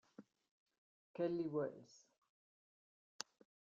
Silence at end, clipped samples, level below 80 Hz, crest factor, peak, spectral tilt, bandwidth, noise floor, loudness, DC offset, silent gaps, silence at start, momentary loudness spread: 1.75 s; under 0.1%; -88 dBFS; 28 dB; -20 dBFS; -5.5 dB/octave; 7.6 kHz; under -90 dBFS; -45 LUFS; under 0.1%; 0.51-0.66 s, 0.78-1.14 s; 0.2 s; 23 LU